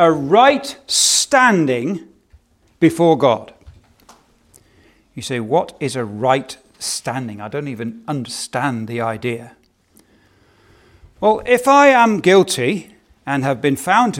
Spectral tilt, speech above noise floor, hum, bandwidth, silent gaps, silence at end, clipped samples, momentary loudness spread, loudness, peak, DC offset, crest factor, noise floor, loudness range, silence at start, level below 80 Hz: -3.5 dB/octave; 39 dB; none; 17 kHz; none; 0 s; under 0.1%; 15 LU; -16 LUFS; 0 dBFS; under 0.1%; 18 dB; -55 dBFS; 10 LU; 0 s; -56 dBFS